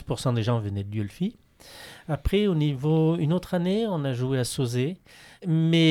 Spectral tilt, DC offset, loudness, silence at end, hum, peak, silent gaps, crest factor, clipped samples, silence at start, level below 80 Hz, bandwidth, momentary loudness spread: -6.5 dB/octave; under 0.1%; -26 LUFS; 0 s; none; -8 dBFS; none; 16 dB; under 0.1%; 0 s; -44 dBFS; 14 kHz; 10 LU